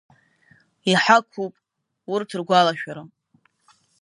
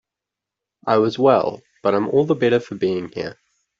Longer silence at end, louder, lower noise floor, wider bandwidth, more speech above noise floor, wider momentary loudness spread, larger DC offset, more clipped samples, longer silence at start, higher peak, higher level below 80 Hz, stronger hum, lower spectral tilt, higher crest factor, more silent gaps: first, 0.95 s vs 0.45 s; about the same, -21 LUFS vs -19 LUFS; second, -64 dBFS vs -86 dBFS; first, 11.5 kHz vs 7.4 kHz; second, 43 dB vs 67 dB; first, 17 LU vs 14 LU; neither; neither; about the same, 0.85 s vs 0.85 s; about the same, 0 dBFS vs -2 dBFS; second, -74 dBFS vs -62 dBFS; neither; second, -4 dB/octave vs -7.5 dB/octave; first, 24 dB vs 18 dB; neither